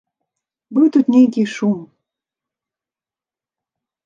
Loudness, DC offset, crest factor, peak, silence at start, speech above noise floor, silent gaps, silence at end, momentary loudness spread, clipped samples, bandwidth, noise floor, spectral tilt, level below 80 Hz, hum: -15 LUFS; under 0.1%; 18 dB; -2 dBFS; 0.7 s; over 76 dB; none; 2.2 s; 9 LU; under 0.1%; 7.4 kHz; under -90 dBFS; -7 dB/octave; -72 dBFS; none